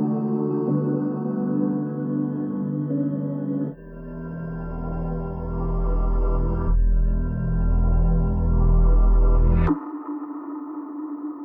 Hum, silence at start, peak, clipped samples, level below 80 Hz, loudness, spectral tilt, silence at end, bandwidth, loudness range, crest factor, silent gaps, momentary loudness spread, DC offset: none; 0 s; -10 dBFS; under 0.1%; -24 dBFS; -25 LUFS; -13.5 dB/octave; 0 s; 2.7 kHz; 6 LU; 12 dB; none; 12 LU; under 0.1%